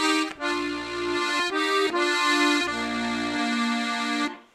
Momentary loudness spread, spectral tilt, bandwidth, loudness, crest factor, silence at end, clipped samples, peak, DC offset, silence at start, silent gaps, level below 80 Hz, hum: 7 LU; -2 dB/octave; 15 kHz; -24 LUFS; 18 dB; 0.15 s; under 0.1%; -8 dBFS; under 0.1%; 0 s; none; -60 dBFS; none